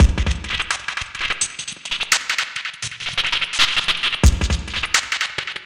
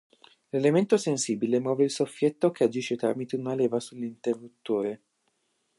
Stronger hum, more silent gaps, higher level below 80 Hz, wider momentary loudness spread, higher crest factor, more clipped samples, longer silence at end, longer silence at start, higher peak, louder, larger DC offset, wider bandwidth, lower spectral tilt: neither; neither; first, -24 dBFS vs -78 dBFS; about the same, 9 LU vs 9 LU; about the same, 18 dB vs 18 dB; neither; second, 0 s vs 0.8 s; second, 0 s vs 0.55 s; first, -2 dBFS vs -10 dBFS; first, -20 LUFS vs -27 LUFS; neither; first, 16.5 kHz vs 11.5 kHz; second, -2.5 dB/octave vs -5.5 dB/octave